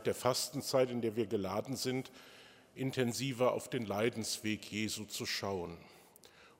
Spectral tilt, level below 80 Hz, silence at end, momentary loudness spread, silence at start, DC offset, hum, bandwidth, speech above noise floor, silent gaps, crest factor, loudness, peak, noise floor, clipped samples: -4 dB/octave; -74 dBFS; 0.1 s; 11 LU; 0 s; under 0.1%; none; 16 kHz; 25 dB; none; 22 dB; -36 LUFS; -16 dBFS; -61 dBFS; under 0.1%